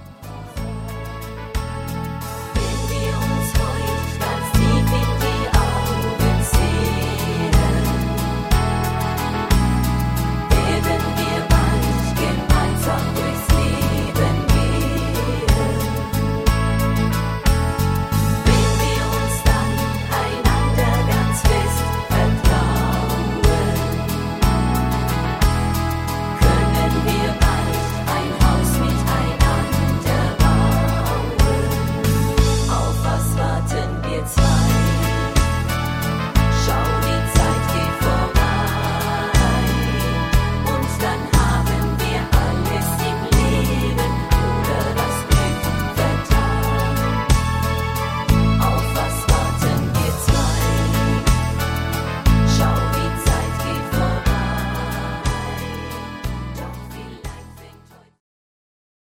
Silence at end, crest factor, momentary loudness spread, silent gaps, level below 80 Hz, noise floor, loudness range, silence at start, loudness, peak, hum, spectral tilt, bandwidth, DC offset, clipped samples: 1.5 s; 16 dB; 6 LU; none; -24 dBFS; -47 dBFS; 2 LU; 0 s; -19 LUFS; -2 dBFS; none; -5.5 dB/octave; 16.5 kHz; under 0.1%; under 0.1%